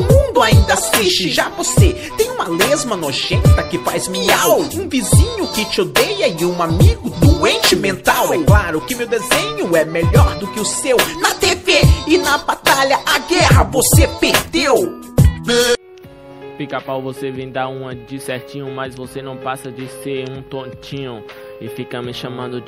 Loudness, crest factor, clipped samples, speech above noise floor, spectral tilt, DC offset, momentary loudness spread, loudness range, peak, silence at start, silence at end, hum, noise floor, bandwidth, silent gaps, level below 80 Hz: -15 LUFS; 16 dB; under 0.1%; 23 dB; -4.5 dB/octave; under 0.1%; 15 LU; 13 LU; 0 dBFS; 0 s; 0 s; none; -38 dBFS; 16 kHz; none; -24 dBFS